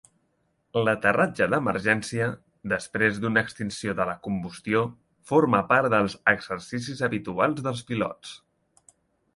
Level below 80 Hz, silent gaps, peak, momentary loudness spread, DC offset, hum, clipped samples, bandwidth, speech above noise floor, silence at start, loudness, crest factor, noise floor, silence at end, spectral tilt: -58 dBFS; none; -4 dBFS; 11 LU; under 0.1%; none; under 0.1%; 11.5 kHz; 46 dB; 0.75 s; -25 LUFS; 22 dB; -71 dBFS; 1 s; -5.5 dB/octave